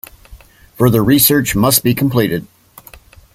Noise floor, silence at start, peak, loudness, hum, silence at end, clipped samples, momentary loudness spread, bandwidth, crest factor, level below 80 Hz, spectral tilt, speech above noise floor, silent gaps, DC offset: -41 dBFS; 0.3 s; 0 dBFS; -13 LUFS; none; 0.9 s; under 0.1%; 7 LU; 17 kHz; 16 dB; -40 dBFS; -4.5 dB/octave; 29 dB; none; under 0.1%